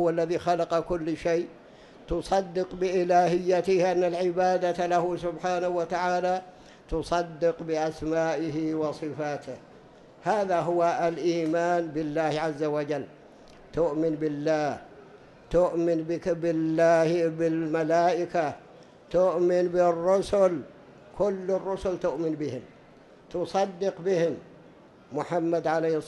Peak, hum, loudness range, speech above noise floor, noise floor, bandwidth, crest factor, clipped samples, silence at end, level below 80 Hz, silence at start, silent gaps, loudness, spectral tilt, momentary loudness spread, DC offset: -10 dBFS; none; 5 LU; 27 dB; -53 dBFS; 11.5 kHz; 16 dB; under 0.1%; 0 s; -54 dBFS; 0 s; none; -27 LUFS; -6.5 dB/octave; 10 LU; under 0.1%